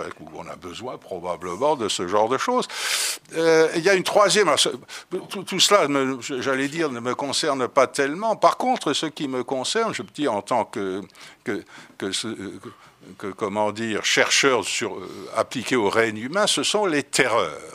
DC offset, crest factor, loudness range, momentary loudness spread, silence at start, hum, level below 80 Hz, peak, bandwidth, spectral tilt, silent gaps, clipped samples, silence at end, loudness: under 0.1%; 22 dB; 7 LU; 16 LU; 0 s; none; -68 dBFS; -2 dBFS; 15.5 kHz; -2.5 dB/octave; none; under 0.1%; 0 s; -22 LUFS